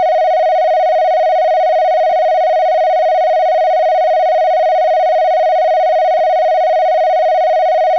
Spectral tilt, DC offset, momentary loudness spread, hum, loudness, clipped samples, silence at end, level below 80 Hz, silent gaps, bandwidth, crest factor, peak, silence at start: -0.5 dB/octave; 0.5%; 0 LU; none; -12 LUFS; under 0.1%; 0 s; -78 dBFS; none; 6.2 kHz; 6 dB; -6 dBFS; 0 s